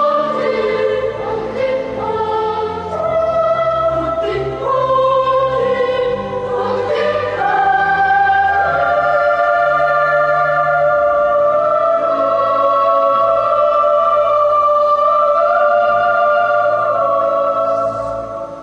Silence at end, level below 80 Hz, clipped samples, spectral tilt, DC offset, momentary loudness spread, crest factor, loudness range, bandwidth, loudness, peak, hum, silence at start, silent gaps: 0 s; -44 dBFS; under 0.1%; -6 dB/octave; under 0.1%; 7 LU; 12 dB; 5 LU; 8.4 kHz; -14 LUFS; -4 dBFS; none; 0 s; none